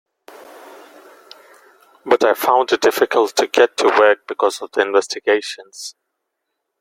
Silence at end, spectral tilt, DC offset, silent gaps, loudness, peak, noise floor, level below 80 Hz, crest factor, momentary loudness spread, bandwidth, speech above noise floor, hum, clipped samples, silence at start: 0.9 s; -2 dB/octave; under 0.1%; none; -16 LUFS; 0 dBFS; -76 dBFS; -66 dBFS; 18 dB; 16 LU; 16.5 kHz; 60 dB; none; under 0.1%; 2.05 s